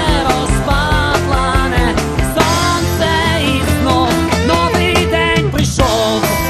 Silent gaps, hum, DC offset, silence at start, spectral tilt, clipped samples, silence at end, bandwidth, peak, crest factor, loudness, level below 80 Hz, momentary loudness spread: none; none; 0.3%; 0 s; -4.5 dB/octave; under 0.1%; 0 s; 14 kHz; 0 dBFS; 14 dB; -13 LUFS; -22 dBFS; 2 LU